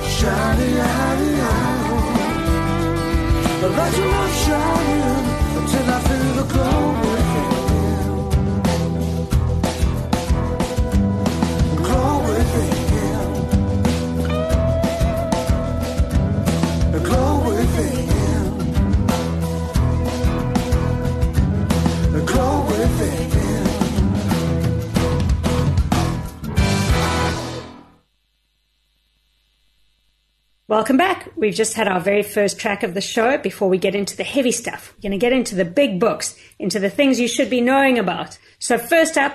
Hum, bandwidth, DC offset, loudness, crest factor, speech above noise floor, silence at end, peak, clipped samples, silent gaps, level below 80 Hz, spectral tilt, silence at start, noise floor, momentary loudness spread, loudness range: none; 13 kHz; under 0.1%; -19 LUFS; 16 dB; 48 dB; 0 s; -4 dBFS; under 0.1%; none; -26 dBFS; -5.5 dB/octave; 0 s; -66 dBFS; 4 LU; 2 LU